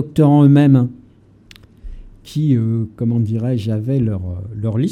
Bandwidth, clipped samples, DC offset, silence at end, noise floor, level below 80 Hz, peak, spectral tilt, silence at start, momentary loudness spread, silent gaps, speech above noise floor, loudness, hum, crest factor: 9.2 kHz; under 0.1%; under 0.1%; 0 s; -47 dBFS; -42 dBFS; 0 dBFS; -9.5 dB/octave; 0 s; 14 LU; none; 33 dB; -16 LUFS; none; 16 dB